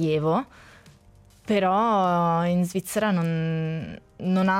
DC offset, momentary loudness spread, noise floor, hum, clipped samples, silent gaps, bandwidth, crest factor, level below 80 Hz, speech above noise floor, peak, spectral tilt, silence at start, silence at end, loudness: under 0.1%; 12 LU; -54 dBFS; none; under 0.1%; none; 16 kHz; 12 dB; -58 dBFS; 30 dB; -12 dBFS; -6.5 dB/octave; 0 s; 0 s; -24 LUFS